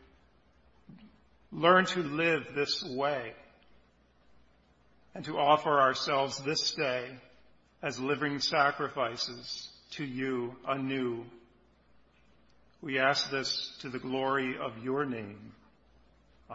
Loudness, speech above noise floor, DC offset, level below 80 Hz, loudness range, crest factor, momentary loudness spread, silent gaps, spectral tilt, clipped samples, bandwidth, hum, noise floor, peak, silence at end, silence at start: -31 LUFS; 34 dB; under 0.1%; -70 dBFS; 6 LU; 24 dB; 15 LU; none; -2 dB/octave; under 0.1%; 7.6 kHz; 60 Hz at -70 dBFS; -65 dBFS; -8 dBFS; 0 s; 0.9 s